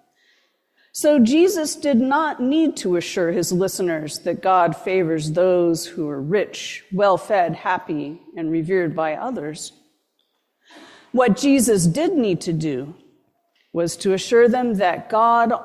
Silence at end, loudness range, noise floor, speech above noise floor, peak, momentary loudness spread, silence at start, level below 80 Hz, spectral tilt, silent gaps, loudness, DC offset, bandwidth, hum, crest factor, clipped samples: 0 s; 4 LU; -70 dBFS; 51 dB; -4 dBFS; 12 LU; 0.95 s; -58 dBFS; -5 dB/octave; none; -20 LUFS; under 0.1%; 15 kHz; none; 16 dB; under 0.1%